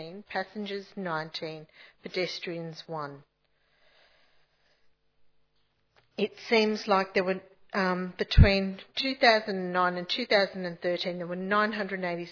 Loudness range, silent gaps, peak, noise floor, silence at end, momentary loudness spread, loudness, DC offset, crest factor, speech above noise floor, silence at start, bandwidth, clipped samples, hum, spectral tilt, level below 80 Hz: 16 LU; none; -6 dBFS; -72 dBFS; 0 s; 15 LU; -28 LUFS; under 0.1%; 24 dB; 44 dB; 0 s; 5.4 kHz; under 0.1%; none; -6 dB/octave; -38 dBFS